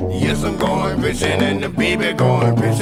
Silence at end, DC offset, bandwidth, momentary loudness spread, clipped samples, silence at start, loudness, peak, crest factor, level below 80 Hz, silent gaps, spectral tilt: 0 s; under 0.1%; 16 kHz; 3 LU; under 0.1%; 0 s; -17 LUFS; -2 dBFS; 14 dB; -36 dBFS; none; -6 dB/octave